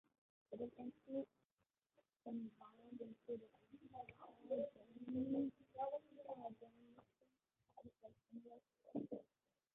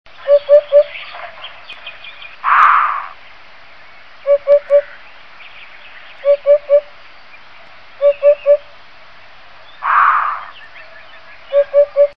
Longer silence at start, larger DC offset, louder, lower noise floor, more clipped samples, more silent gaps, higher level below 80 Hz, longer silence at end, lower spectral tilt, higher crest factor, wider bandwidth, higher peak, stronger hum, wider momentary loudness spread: first, 0.5 s vs 0.25 s; second, under 0.1% vs 1%; second, -51 LUFS vs -13 LUFS; first, under -90 dBFS vs -42 dBFS; neither; first, 1.45-1.57 s vs none; second, -84 dBFS vs -56 dBFS; first, 0.5 s vs 0.1 s; first, -5.5 dB/octave vs -3 dB/octave; about the same, 20 dB vs 16 dB; second, 3.9 kHz vs 5.4 kHz; second, -32 dBFS vs 0 dBFS; neither; second, 19 LU vs 25 LU